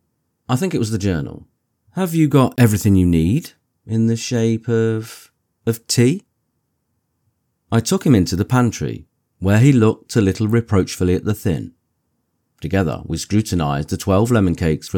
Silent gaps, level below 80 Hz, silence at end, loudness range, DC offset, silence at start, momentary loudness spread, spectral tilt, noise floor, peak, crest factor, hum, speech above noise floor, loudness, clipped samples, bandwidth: none; -42 dBFS; 0 s; 5 LU; under 0.1%; 0.5 s; 12 LU; -6.5 dB/octave; -70 dBFS; -2 dBFS; 16 dB; none; 54 dB; -18 LUFS; under 0.1%; 18.5 kHz